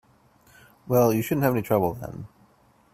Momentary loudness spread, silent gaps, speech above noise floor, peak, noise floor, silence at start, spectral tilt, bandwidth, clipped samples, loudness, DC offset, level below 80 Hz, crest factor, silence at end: 19 LU; none; 37 dB; -6 dBFS; -60 dBFS; 0.85 s; -7 dB/octave; 16 kHz; under 0.1%; -23 LUFS; under 0.1%; -56 dBFS; 20 dB; 0.65 s